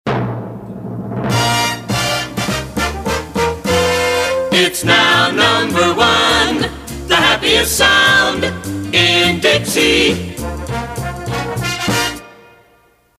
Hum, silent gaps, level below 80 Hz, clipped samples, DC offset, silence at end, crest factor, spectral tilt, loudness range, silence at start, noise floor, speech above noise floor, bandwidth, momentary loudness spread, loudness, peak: none; none; -34 dBFS; under 0.1%; under 0.1%; 0.85 s; 14 dB; -3 dB/octave; 6 LU; 0.05 s; -53 dBFS; 40 dB; 16 kHz; 13 LU; -14 LUFS; 0 dBFS